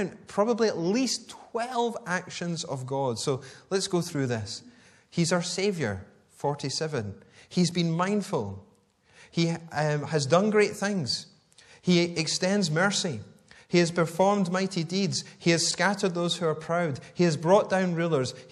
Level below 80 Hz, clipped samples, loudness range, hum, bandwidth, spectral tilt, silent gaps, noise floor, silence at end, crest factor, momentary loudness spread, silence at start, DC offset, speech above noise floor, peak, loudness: -68 dBFS; under 0.1%; 5 LU; none; 12.5 kHz; -4.5 dB/octave; none; -62 dBFS; 0.05 s; 20 dB; 9 LU; 0 s; under 0.1%; 35 dB; -8 dBFS; -27 LUFS